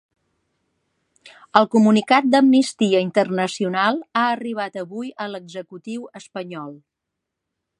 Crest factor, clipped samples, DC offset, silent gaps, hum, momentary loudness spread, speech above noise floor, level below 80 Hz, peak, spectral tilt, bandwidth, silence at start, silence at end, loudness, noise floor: 20 dB; under 0.1%; under 0.1%; none; none; 18 LU; 62 dB; -72 dBFS; 0 dBFS; -5 dB/octave; 11.5 kHz; 1.55 s; 1.05 s; -19 LUFS; -82 dBFS